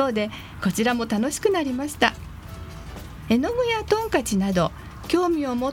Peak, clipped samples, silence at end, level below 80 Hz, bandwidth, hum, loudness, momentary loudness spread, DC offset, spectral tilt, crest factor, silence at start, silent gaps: -4 dBFS; under 0.1%; 0 s; -44 dBFS; 18 kHz; none; -23 LUFS; 16 LU; under 0.1%; -5 dB/octave; 20 dB; 0 s; none